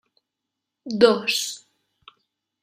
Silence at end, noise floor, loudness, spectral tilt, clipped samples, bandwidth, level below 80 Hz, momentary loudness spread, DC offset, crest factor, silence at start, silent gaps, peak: 1.05 s; -83 dBFS; -21 LUFS; -3 dB/octave; under 0.1%; 15.5 kHz; -68 dBFS; 22 LU; under 0.1%; 24 dB; 0.85 s; none; -2 dBFS